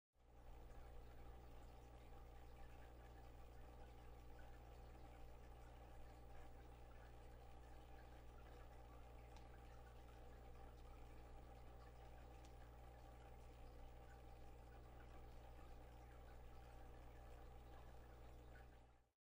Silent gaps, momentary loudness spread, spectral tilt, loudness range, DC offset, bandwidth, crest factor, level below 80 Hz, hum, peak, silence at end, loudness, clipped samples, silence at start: none; 1 LU; -6 dB/octave; 0 LU; under 0.1%; 16 kHz; 14 dB; -62 dBFS; 60 Hz at -65 dBFS; -48 dBFS; 0.25 s; -64 LUFS; under 0.1%; 0.15 s